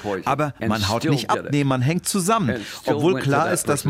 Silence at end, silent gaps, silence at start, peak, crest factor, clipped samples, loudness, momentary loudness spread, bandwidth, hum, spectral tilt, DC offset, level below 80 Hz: 0 s; none; 0 s; -6 dBFS; 16 dB; under 0.1%; -21 LUFS; 4 LU; 16 kHz; none; -5 dB/octave; under 0.1%; -56 dBFS